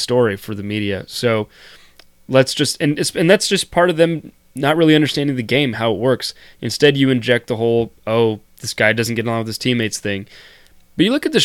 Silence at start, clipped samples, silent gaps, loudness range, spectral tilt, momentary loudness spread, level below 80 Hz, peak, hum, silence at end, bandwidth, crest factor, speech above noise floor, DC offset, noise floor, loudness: 0 s; under 0.1%; none; 3 LU; -4.5 dB/octave; 11 LU; -52 dBFS; 0 dBFS; none; 0 s; 17 kHz; 18 dB; 26 dB; under 0.1%; -43 dBFS; -17 LUFS